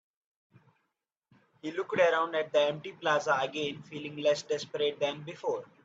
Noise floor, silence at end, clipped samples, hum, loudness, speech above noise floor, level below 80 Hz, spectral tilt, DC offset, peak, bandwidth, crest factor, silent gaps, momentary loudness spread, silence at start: -84 dBFS; 0.2 s; under 0.1%; none; -31 LUFS; 53 dB; -80 dBFS; -4 dB/octave; under 0.1%; -12 dBFS; 7.8 kHz; 20 dB; none; 11 LU; 1.65 s